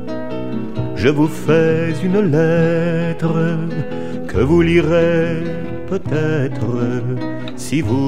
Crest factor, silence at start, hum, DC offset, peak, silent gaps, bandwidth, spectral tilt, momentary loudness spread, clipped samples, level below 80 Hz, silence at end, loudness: 16 dB; 0 s; none; 5%; 0 dBFS; none; 14 kHz; -7.5 dB/octave; 11 LU; under 0.1%; -40 dBFS; 0 s; -17 LUFS